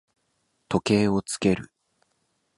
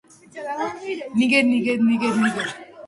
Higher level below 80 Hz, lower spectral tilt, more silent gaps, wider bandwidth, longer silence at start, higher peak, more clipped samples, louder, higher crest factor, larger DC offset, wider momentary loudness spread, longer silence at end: first, -54 dBFS vs -66 dBFS; about the same, -5.5 dB/octave vs -5 dB/octave; neither; about the same, 11.5 kHz vs 11.5 kHz; first, 0.7 s vs 0.35 s; about the same, -6 dBFS vs -4 dBFS; neither; second, -24 LUFS vs -21 LUFS; about the same, 20 dB vs 18 dB; neither; second, 7 LU vs 13 LU; first, 0.95 s vs 0 s